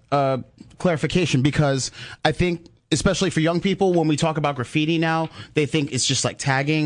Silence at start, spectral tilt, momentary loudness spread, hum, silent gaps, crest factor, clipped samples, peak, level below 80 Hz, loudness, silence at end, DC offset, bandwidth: 0.1 s; -5 dB/octave; 6 LU; none; none; 18 dB; under 0.1%; -2 dBFS; -46 dBFS; -21 LUFS; 0 s; under 0.1%; 10.5 kHz